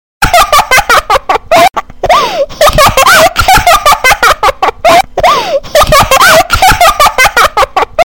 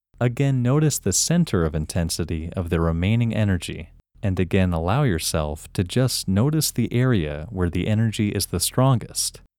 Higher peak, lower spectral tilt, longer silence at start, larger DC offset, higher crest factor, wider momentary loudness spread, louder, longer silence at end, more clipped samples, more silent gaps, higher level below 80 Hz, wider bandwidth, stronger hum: first, 0 dBFS vs -6 dBFS; second, -2 dB/octave vs -5 dB/octave; about the same, 0.2 s vs 0.2 s; first, 3% vs under 0.1%; second, 6 dB vs 16 dB; about the same, 6 LU vs 7 LU; first, -5 LUFS vs -22 LUFS; second, 0.05 s vs 0.2 s; first, 1% vs under 0.1%; neither; first, -22 dBFS vs -38 dBFS; about the same, over 20 kHz vs 18.5 kHz; neither